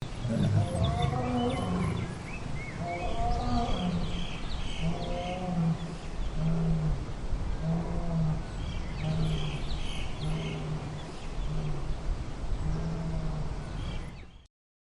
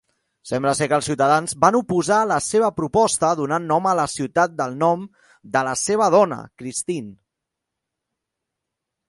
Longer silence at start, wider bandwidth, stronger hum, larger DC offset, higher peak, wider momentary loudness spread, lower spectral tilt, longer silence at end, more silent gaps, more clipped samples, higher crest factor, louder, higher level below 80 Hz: second, 0 s vs 0.45 s; about the same, 11.5 kHz vs 11.5 kHz; neither; neither; second, -16 dBFS vs 0 dBFS; about the same, 9 LU vs 11 LU; first, -7 dB/octave vs -4.5 dB/octave; second, 0.45 s vs 1.95 s; neither; neither; about the same, 16 dB vs 20 dB; second, -33 LUFS vs -20 LUFS; first, -36 dBFS vs -56 dBFS